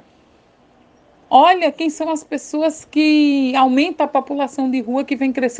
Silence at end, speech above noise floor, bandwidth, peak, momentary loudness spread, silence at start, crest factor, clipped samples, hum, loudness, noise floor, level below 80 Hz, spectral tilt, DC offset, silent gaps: 0 s; 37 dB; 9.4 kHz; 0 dBFS; 10 LU; 1.3 s; 18 dB; under 0.1%; none; -17 LUFS; -53 dBFS; -64 dBFS; -3 dB/octave; under 0.1%; none